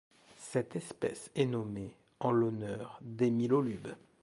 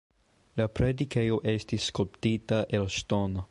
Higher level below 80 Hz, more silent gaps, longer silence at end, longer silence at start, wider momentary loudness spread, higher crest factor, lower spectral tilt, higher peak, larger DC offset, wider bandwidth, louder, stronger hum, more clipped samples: second, -68 dBFS vs -46 dBFS; neither; first, 0.25 s vs 0.05 s; second, 0.4 s vs 0.55 s; first, 14 LU vs 3 LU; about the same, 18 dB vs 16 dB; about the same, -7 dB/octave vs -6 dB/octave; second, -16 dBFS vs -12 dBFS; neither; about the same, 11.5 kHz vs 11.5 kHz; second, -35 LUFS vs -29 LUFS; neither; neither